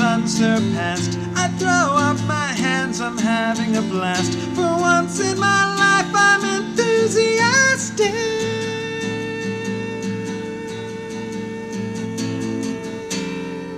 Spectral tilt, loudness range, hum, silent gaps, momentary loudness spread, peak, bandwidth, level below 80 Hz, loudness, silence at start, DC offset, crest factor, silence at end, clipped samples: -4 dB/octave; 10 LU; none; none; 13 LU; -4 dBFS; 14.5 kHz; -54 dBFS; -19 LUFS; 0 s; under 0.1%; 16 dB; 0 s; under 0.1%